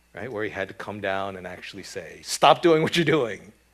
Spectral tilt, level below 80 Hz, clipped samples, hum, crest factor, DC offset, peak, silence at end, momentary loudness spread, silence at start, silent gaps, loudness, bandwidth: -4.5 dB/octave; -62 dBFS; under 0.1%; none; 22 dB; under 0.1%; -2 dBFS; 0.25 s; 18 LU; 0.15 s; none; -23 LUFS; 14.5 kHz